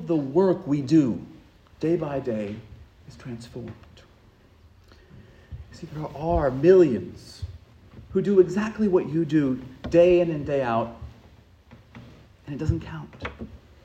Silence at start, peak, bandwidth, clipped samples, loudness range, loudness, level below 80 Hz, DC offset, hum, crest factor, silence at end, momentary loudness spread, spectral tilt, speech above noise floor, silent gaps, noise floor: 0 s; -4 dBFS; 8.4 kHz; under 0.1%; 15 LU; -23 LUFS; -46 dBFS; under 0.1%; none; 20 dB; 0.3 s; 23 LU; -8.5 dB/octave; 32 dB; none; -55 dBFS